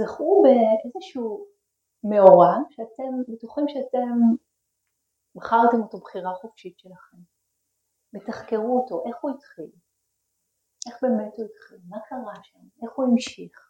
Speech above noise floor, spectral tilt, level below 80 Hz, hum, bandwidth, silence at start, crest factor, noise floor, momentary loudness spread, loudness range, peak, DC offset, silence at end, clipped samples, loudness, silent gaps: 55 dB; -7 dB/octave; -72 dBFS; none; 9 kHz; 0 s; 24 dB; -77 dBFS; 23 LU; 12 LU; 0 dBFS; under 0.1%; 0.2 s; under 0.1%; -21 LUFS; none